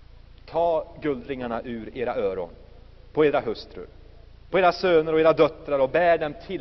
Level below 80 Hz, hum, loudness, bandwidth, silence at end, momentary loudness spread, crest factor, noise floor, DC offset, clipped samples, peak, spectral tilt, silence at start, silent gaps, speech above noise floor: -48 dBFS; none; -24 LUFS; 6.2 kHz; 0 s; 14 LU; 18 dB; -47 dBFS; under 0.1%; under 0.1%; -6 dBFS; -4 dB/octave; 0.15 s; none; 24 dB